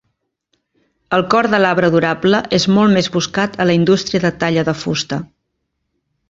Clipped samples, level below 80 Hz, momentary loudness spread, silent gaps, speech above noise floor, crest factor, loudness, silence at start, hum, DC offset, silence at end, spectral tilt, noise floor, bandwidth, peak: under 0.1%; -50 dBFS; 7 LU; none; 58 dB; 16 dB; -15 LUFS; 1.1 s; none; under 0.1%; 1.05 s; -5.5 dB/octave; -72 dBFS; 7.8 kHz; -2 dBFS